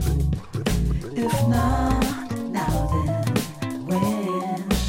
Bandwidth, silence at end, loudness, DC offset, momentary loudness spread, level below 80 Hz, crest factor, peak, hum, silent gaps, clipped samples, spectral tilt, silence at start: 17 kHz; 0 s; -24 LUFS; under 0.1%; 6 LU; -30 dBFS; 16 dB; -6 dBFS; none; none; under 0.1%; -6 dB/octave; 0 s